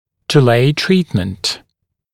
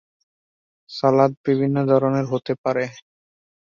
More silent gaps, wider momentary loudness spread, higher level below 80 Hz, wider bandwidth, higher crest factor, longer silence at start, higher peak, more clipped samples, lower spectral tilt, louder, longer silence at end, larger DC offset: second, none vs 1.37-1.44 s, 2.58-2.64 s; about the same, 9 LU vs 8 LU; first, -46 dBFS vs -64 dBFS; first, 15.5 kHz vs 7.2 kHz; about the same, 16 dB vs 18 dB; second, 0.3 s vs 0.9 s; first, 0 dBFS vs -4 dBFS; neither; second, -5.5 dB/octave vs -8 dB/octave; first, -15 LUFS vs -20 LUFS; about the same, 0.55 s vs 0.6 s; neither